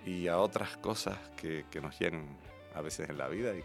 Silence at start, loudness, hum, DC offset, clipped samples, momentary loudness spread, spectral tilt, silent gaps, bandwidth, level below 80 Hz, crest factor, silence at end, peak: 0 s; -37 LUFS; none; under 0.1%; under 0.1%; 13 LU; -4.5 dB/octave; none; 16 kHz; -62 dBFS; 22 dB; 0 s; -16 dBFS